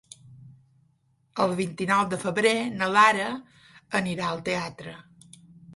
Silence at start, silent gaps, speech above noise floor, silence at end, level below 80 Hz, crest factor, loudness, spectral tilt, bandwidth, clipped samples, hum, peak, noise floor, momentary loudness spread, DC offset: 0.3 s; none; 42 dB; 0 s; -64 dBFS; 22 dB; -25 LUFS; -4.5 dB/octave; 11.5 kHz; under 0.1%; none; -4 dBFS; -67 dBFS; 18 LU; under 0.1%